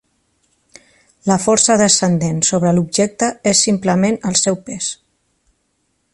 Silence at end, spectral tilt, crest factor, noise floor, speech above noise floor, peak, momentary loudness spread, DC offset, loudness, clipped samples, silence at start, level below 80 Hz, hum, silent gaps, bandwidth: 1.2 s; -4 dB/octave; 16 dB; -66 dBFS; 51 dB; 0 dBFS; 11 LU; under 0.1%; -15 LUFS; under 0.1%; 1.25 s; -52 dBFS; none; none; 11.5 kHz